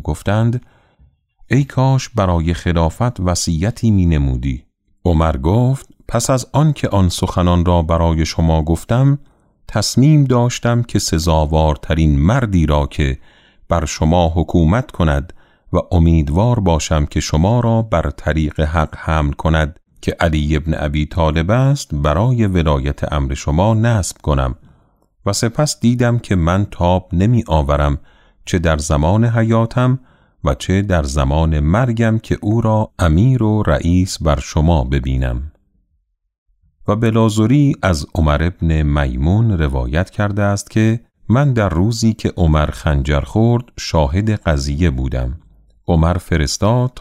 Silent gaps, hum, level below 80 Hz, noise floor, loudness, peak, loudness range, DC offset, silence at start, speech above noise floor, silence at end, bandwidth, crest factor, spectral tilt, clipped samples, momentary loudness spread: 36.38-36.46 s; none; -24 dBFS; -65 dBFS; -16 LUFS; -2 dBFS; 2 LU; under 0.1%; 0 s; 51 dB; 0 s; 14.5 kHz; 14 dB; -6.5 dB/octave; under 0.1%; 6 LU